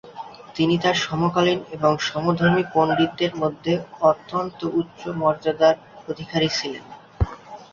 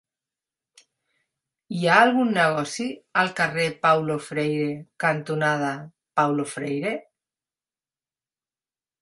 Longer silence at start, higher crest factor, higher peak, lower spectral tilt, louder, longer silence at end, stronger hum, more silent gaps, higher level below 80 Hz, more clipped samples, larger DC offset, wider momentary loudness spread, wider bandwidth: second, 0.05 s vs 1.7 s; second, 18 dB vs 24 dB; second, -4 dBFS vs 0 dBFS; about the same, -5.5 dB/octave vs -5 dB/octave; about the same, -22 LUFS vs -23 LUFS; second, 0.1 s vs 2 s; neither; neither; first, -42 dBFS vs -70 dBFS; neither; neither; about the same, 12 LU vs 11 LU; second, 7.4 kHz vs 11.5 kHz